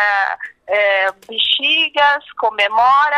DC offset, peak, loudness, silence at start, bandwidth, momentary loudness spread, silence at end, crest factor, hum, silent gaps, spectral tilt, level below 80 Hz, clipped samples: under 0.1%; -2 dBFS; -15 LUFS; 0 s; 12 kHz; 8 LU; 0 s; 14 dB; none; none; -1 dB/octave; -62 dBFS; under 0.1%